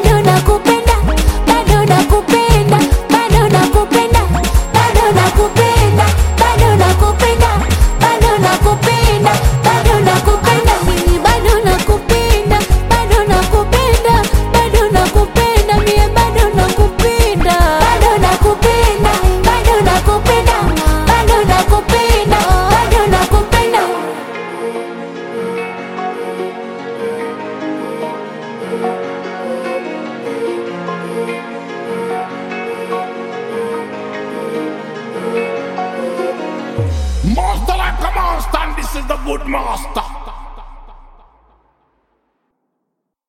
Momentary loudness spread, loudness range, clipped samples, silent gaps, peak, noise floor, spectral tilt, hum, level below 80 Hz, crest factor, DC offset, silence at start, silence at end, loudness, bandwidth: 12 LU; 11 LU; under 0.1%; none; 0 dBFS; -73 dBFS; -5 dB/octave; none; -18 dBFS; 12 dB; under 0.1%; 0 s; 2.3 s; -13 LUFS; 17 kHz